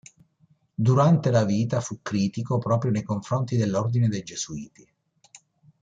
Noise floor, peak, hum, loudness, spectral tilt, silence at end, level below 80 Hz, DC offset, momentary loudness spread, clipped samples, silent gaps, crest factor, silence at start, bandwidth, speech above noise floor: -64 dBFS; -8 dBFS; none; -24 LUFS; -7 dB/octave; 1.15 s; -60 dBFS; under 0.1%; 13 LU; under 0.1%; none; 18 dB; 0.8 s; 7.8 kHz; 40 dB